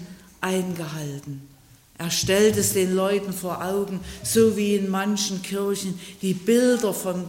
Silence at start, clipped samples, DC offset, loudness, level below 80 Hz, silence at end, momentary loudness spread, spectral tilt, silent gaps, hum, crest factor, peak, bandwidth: 0 s; under 0.1%; under 0.1%; -23 LUFS; -54 dBFS; 0 s; 13 LU; -4.5 dB/octave; none; none; 16 dB; -8 dBFS; 16.5 kHz